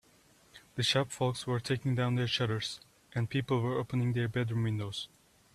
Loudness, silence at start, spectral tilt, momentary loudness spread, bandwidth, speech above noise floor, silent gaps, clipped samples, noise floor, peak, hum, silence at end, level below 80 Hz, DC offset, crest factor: -33 LUFS; 0.55 s; -5.5 dB/octave; 10 LU; 13.5 kHz; 32 dB; none; under 0.1%; -64 dBFS; -14 dBFS; none; 0.5 s; -64 dBFS; under 0.1%; 18 dB